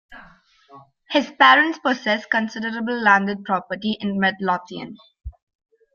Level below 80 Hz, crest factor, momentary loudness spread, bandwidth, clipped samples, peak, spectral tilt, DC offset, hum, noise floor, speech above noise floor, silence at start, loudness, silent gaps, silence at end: -52 dBFS; 22 dB; 13 LU; 7 kHz; under 0.1%; 0 dBFS; -5 dB/octave; under 0.1%; none; -51 dBFS; 30 dB; 0.1 s; -19 LUFS; none; 0.65 s